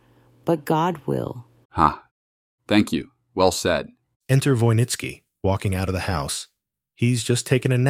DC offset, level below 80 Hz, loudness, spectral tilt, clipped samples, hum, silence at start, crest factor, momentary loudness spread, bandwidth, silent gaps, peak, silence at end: under 0.1%; -46 dBFS; -23 LUFS; -5.5 dB/octave; under 0.1%; none; 0.45 s; 20 dB; 13 LU; 16 kHz; 1.65-1.70 s, 2.11-2.58 s, 4.16-4.21 s; -2 dBFS; 0 s